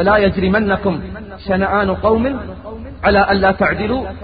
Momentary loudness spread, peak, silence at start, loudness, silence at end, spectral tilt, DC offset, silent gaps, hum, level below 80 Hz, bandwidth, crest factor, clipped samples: 16 LU; 0 dBFS; 0 s; -15 LUFS; 0 s; -11.5 dB/octave; 0.1%; none; none; -32 dBFS; 5 kHz; 14 dB; under 0.1%